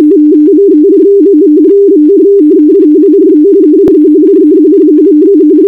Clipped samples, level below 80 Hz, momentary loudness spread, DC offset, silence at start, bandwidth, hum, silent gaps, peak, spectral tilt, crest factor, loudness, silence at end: 5%; -48 dBFS; 0 LU; 0.5%; 0 s; 1.6 kHz; none; none; 0 dBFS; -9.5 dB/octave; 4 dB; -4 LUFS; 0 s